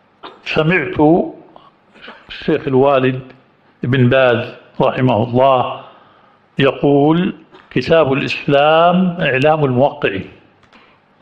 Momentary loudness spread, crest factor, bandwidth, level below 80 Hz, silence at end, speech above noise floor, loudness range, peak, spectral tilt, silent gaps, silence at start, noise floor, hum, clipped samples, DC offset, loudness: 14 LU; 14 dB; 7.6 kHz; -48 dBFS; 0.9 s; 36 dB; 3 LU; -2 dBFS; -8 dB/octave; none; 0.25 s; -50 dBFS; none; under 0.1%; under 0.1%; -14 LUFS